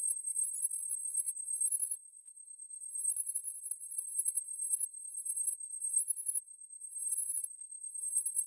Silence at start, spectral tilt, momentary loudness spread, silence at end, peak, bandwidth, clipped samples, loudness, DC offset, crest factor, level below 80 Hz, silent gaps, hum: 0 s; 5 dB/octave; 12 LU; 0 s; -20 dBFS; 11.5 kHz; under 0.1%; -34 LUFS; under 0.1%; 18 dB; under -90 dBFS; none; none